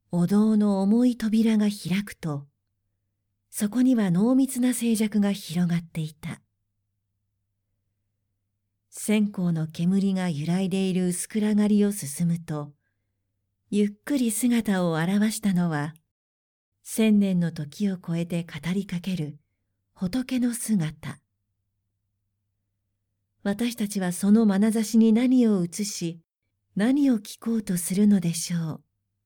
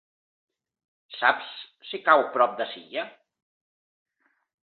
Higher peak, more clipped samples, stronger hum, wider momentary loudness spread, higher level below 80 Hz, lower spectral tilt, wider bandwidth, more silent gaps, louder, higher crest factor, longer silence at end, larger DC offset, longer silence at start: second, -10 dBFS vs -4 dBFS; neither; neither; second, 12 LU vs 19 LU; first, -62 dBFS vs -84 dBFS; about the same, -6 dB/octave vs -6 dB/octave; first, 19.5 kHz vs 4.6 kHz; first, 16.11-16.72 s vs none; about the same, -25 LUFS vs -24 LUFS; second, 14 dB vs 24 dB; second, 0.5 s vs 1.6 s; neither; second, 0.1 s vs 1.1 s